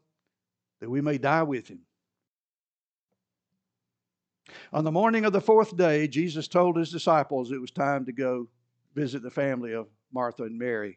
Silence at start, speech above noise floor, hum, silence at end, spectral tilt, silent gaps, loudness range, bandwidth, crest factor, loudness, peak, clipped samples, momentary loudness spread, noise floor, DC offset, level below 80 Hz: 0.8 s; over 64 dB; none; 0.05 s; -7 dB/octave; 2.28-3.09 s; 9 LU; 8.6 kHz; 20 dB; -26 LUFS; -8 dBFS; under 0.1%; 12 LU; under -90 dBFS; under 0.1%; -84 dBFS